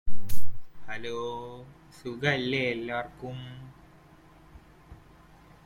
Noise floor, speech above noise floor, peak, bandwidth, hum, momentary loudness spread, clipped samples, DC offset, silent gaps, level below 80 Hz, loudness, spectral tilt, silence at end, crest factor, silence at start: -55 dBFS; 22 dB; -8 dBFS; 16.5 kHz; none; 26 LU; under 0.1%; under 0.1%; none; -46 dBFS; -33 LUFS; -5.5 dB/octave; 2.1 s; 16 dB; 0.05 s